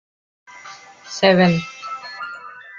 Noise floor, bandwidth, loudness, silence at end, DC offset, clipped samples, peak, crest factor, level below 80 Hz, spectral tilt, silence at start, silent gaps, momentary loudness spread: -41 dBFS; 7.4 kHz; -18 LUFS; 0 s; under 0.1%; under 0.1%; -2 dBFS; 20 dB; -58 dBFS; -5.5 dB/octave; 0.55 s; none; 25 LU